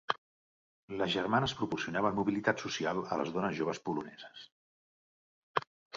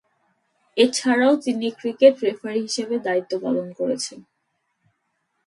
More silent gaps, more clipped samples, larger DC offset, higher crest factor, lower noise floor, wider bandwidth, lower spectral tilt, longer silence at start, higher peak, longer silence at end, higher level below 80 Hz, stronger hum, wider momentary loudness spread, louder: first, 0.18-0.88 s, 4.52-5.55 s, 5.67-5.90 s vs none; neither; neither; first, 26 dB vs 20 dB; first, under -90 dBFS vs -74 dBFS; second, 7.6 kHz vs 11.5 kHz; about the same, -3.5 dB/octave vs -3.5 dB/octave; second, 0.1 s vs 0.75 s; second, -10 dBFS vs -2 dBFS; second, 0 s vs 1.25 s; first, -66 dBFS vs -74 dBFS; neither; about the same, 12 LU vs 10 LU; second, -34 LUFS vs -21 LUFS